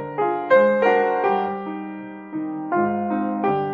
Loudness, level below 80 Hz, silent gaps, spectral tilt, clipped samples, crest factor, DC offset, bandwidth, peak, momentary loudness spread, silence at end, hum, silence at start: -21 LUFS; -64 dBFS; none; -8.5 dB/octave; under 0.1%; 16 dB; under 0.1%; 5.2 kHz; -4 dBFS; 15 LU; 0 s; none; 0 s